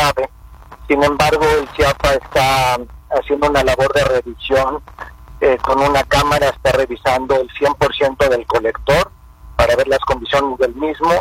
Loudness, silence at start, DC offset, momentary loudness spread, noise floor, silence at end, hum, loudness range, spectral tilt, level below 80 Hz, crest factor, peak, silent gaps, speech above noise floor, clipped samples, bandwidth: -15 LUFS; 0 s; under 0.1%; 8 LU; -38 dBFS; 0 s; none; 1 LU; -4.5 dB/octave; -32 dBFS; 14 dB; -2 dBFS; none; 23 dB; under 0.1%; 16.5 kHz